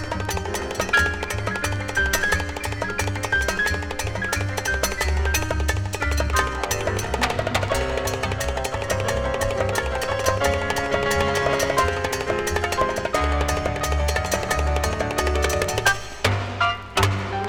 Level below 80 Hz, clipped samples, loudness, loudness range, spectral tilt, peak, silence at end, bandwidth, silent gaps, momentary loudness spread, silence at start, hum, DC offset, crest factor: -30 dBFS; under 0.1%; -23 LUFS; 2 LU; -4 dB/octave; -4 dBFS; 0 s; 19 kHz; none; 5 LU; 0 s; none; under 0.1%; 18 dB